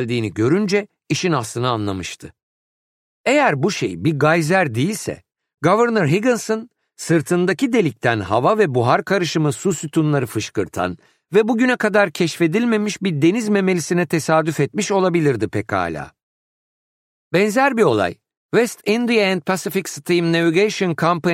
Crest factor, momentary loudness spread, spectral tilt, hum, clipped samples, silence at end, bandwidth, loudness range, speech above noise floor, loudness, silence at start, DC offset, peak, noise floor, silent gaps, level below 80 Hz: 18 dB; 8 LU; -5.5 dB/octave; none; under 0.1%; 0 s; 16 kHz; 3 LU; over 72 dB; -18 LUFS; 0 s; under 0.1%; -2 dBFS; under -90 dBFS; 2.43-3.24 s, 16.23-17.31 s, 18.37-18.49 s; -58 dBFS